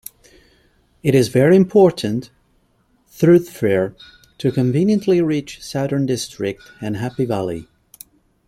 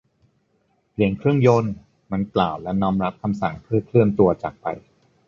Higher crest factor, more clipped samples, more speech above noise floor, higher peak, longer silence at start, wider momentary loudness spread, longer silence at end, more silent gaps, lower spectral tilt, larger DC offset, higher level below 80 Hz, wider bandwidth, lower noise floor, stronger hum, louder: about the same, 16 dB vs 20 dB; neither; about the same, 44 dB vs 46 dB; about the same, -2 dBFS vs -2 dBFS; about the same, 1.05 s vs 1 s; about the same, 14 LU vs 14 LU; first, 0.85 s vs 0.5 s; neither; second, -7 dB/octave vs -8.5 dB/octave; neither; second, -54 dBFS vs -48 dBFS; first, 16 kHz vs 7.2 kHz; second, -60 dBFS vs -66 dBFS; neither; first, -18 LUFS vs -21 LUFS